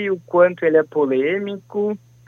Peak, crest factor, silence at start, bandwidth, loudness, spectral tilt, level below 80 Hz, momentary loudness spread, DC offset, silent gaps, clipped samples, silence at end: -2 dBFS; 16 dB; 0 s; 6.6 kHz; -19 LUFS; -8 dB/octave; -72 dBFS; 9 LU; under 0.1%; none; under 0.1%; 0.3 s